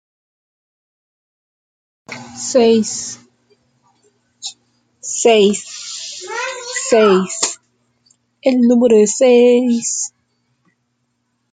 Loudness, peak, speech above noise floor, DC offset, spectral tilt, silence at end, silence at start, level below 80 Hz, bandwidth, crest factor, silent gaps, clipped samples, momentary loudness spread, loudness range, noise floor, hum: -14 LUFS; -2 dBFS; 56 dB; under 0.1%; -3.5 dB/octave; 1.45 s; 2.1 s; -64 dBFS; 9.6 kHz; 16 dB; none; under 0.1%; 19 LU; 7 LU; -68 dBFS; none